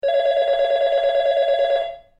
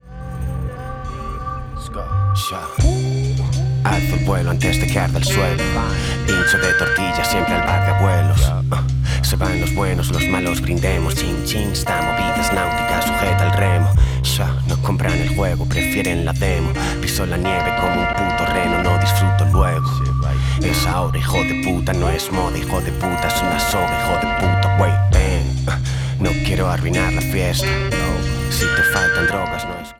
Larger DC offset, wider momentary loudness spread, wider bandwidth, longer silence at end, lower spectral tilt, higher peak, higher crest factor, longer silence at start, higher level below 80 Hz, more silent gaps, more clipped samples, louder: neither; second, 1 LU vs 6 LU; second, 7.6 kHz vs 17 kHz; first, 0.2 s vs 0.05 s; second, -2 dB/octave vs -5 dB/octave; second, -10 dBFS vs -2 dBFS; second, 10 dB vs 16 dB; about the same, 0.05 s vs 0.05 s; second, -54 dBFS vs -26 dBFS; neither; neither; about the same, -19 LUFS vs -18 LUFS